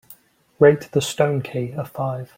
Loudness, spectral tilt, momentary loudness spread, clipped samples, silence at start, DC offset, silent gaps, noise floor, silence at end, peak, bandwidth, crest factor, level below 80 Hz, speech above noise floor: -20 LUFS; -5.5 dB/octave; 11 LU; under 0.1%; 0.1 s; under 0.1%; none; -50 dBFS; 0.1 s; -2 dBFS; 16.5 kHz; 18 dB; -58 dBFS; 30 dB